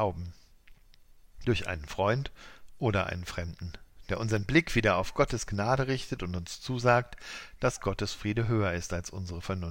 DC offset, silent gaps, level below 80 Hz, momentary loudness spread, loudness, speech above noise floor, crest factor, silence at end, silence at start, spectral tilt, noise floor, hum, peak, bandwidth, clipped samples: under 0.1%; none; -46 dBFS; 15 LU; -30 LUFS; 26 dB; 20 dB; 0 s; 0 s; -5.5 dB/octave; -56 dBFS; none; -10 dBFS; 16 kHz; under 0.1%